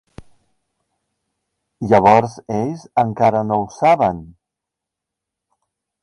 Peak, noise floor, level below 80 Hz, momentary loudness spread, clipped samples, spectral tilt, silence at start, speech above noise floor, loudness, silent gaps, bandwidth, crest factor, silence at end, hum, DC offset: 0 dBFS; -83 dBFS; -50 dBFS; 11 LU; under 0.1%; -7 dB/octave; 0.2 s; 67 dB; -16 LUFS; none; 11 kHz; 18 dB; 1.75 s; none; under 0.1%